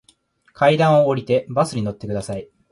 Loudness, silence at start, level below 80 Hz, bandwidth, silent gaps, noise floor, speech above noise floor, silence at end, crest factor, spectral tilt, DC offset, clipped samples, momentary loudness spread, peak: -19 LUFS; 0.6 s; -52 dBFS; 11.5 kHz; none; -58 dBFS; 40 dB; 0.25 s; 16 dB; -6.5 dB/octave; under 0.1%; under 0.1%; 13 LU; -4 dBFS